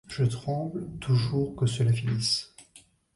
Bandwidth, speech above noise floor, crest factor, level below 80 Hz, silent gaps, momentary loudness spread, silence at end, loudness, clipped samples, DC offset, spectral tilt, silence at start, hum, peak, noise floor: 11.5 kHz; 31 dB; 14 dB; -54 dBFS; none; 8 LU; 0.35 s; -28 LUFS; under 0.1%; under 0.1%; -5.5 dB/octave; 0.1 s; none; -14 dBFS; -58 dBFS